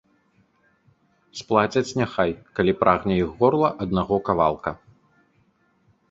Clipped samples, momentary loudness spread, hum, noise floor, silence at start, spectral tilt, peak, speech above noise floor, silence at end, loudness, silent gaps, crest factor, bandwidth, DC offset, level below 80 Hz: under 0.1%; 12 LU; none; -64 dBFS; 1.35 s; -6.5 dB/octave; -2 dBFS; 42 dB; 1.35 s; -22 LUFS; none; 22 dB; 7.8 kHz; under 0.1%; -48 dBFS